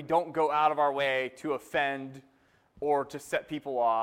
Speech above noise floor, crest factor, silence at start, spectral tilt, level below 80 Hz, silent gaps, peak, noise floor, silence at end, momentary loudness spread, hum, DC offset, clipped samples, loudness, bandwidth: 33 dB; 16 dB; 0 s; -4.5 dB/octave; -70 dBFS; none; -12 dBFS; -62 dBFS; 0 s; 9 LU; none; under 0.1%; under 0.1%; -29 LUFS; 16.5 kHz